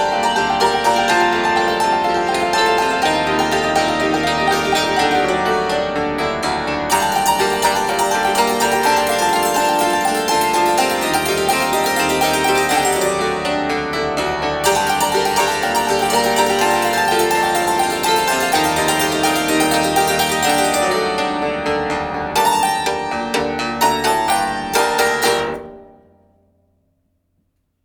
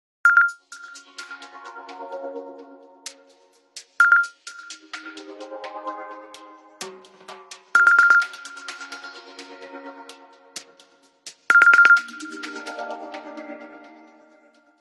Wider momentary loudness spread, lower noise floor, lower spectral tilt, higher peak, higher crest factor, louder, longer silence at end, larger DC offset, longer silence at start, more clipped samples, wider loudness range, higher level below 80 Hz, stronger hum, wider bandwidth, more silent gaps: second, 5 LU vs 26 LU; first, -66 dBFS vs -57 dBFS; first, -2.5 dB/octave vs 0 dB/octave; about the same, -2 dBFS vs -2 dBFS; second, 14 dB vs 22 dB; about the same, -16 LUFS vs -16 LUFS; first, 2 s vs 1.25 s; neither; second, 0 s vs 0.25 s; neither; second, 2 LU vs 18 LU; first, -44 dBFS vs -84 dBFS; neither; first, over 20 kHz vs 12 kHz; neither